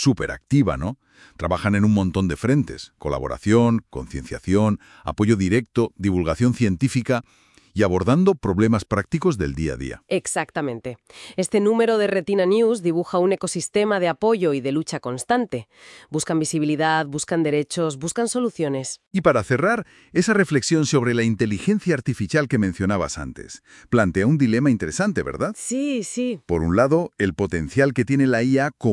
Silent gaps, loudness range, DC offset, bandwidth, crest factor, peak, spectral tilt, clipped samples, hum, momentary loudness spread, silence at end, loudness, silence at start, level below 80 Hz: 19.07-19.11 s; 2 LU; under 0.1%; 12 kHz; 18 dB; -2 dBFS; -6 dB/octave; under 0.1%; none; 10 LU; 0 s; -21 LUFS; 0 s; -46 dBFS